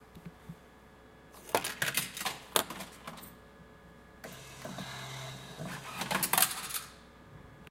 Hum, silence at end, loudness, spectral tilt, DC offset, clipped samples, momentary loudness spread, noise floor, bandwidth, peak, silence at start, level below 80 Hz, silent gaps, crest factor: none; 0 s; -34 LUFS; -1.5 dB/octave; under 0.1%; under 0.1%; 25 LU; -56 dBFS; 17 kHz; -4 dBFS; 0 s; -64 dBFS; none; 34 dB